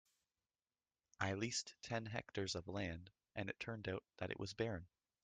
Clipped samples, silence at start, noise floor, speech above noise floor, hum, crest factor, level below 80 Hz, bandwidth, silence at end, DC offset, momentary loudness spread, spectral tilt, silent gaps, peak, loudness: under 0.1%; 1.2 s; under -90 dBFS; over 44 dB; none; 24 dB; -72 dBFS; 9.6 kHz; 0.35 s; under 0.1%; 6 LU; -4 dB/octave; none; -24 dBFS; -46 LUFS